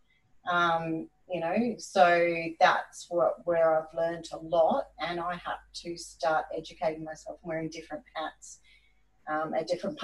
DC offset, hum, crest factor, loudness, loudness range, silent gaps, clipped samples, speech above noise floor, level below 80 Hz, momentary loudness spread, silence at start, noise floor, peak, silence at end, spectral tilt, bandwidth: under 0.1%; none; 22 dB; -29 LUFS; 9 LU; none; under 0.1%; 37 dB; -64 dBFS; 15 LU; 0.45 s; -67 dBFS; -8 dBFS; 0 s; -4.5 dB/octave; 12 kHz